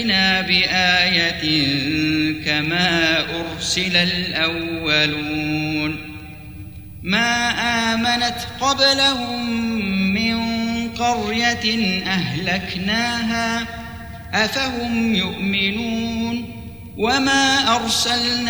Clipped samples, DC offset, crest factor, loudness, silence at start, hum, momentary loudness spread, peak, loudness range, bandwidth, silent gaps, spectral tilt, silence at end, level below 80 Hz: under 0.1%; 0.3%; 18 dB; -18 LUFS; 0 s; none; 10 LU; -2 dBFS; 4 LU; over 20 kHz; none; -3.5 dB/octave; 0 s; -44 dBFS